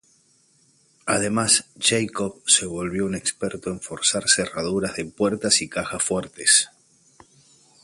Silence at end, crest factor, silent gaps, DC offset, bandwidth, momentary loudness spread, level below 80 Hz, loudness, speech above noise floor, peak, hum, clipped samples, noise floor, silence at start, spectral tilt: 1.15 s; 22 dB; none; under 0.1%; 11.5 kHz; 11 LU; -54 dBFS; -21 LUFS; 38 dB; -2 dBFS; none; under 0.1%; -61 dBFS; 1.05 s; -2 dB/octave